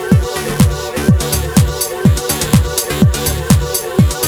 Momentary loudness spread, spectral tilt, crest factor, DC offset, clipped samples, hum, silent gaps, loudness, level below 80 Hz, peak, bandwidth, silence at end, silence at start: 3 LU; -5 dB/octave; 14 dB; under 0.1%; under 0.1%; none; none; -14 LUFS; -22 dBFS; 0 dBFS; over 20 kHz; 0 s; 0 s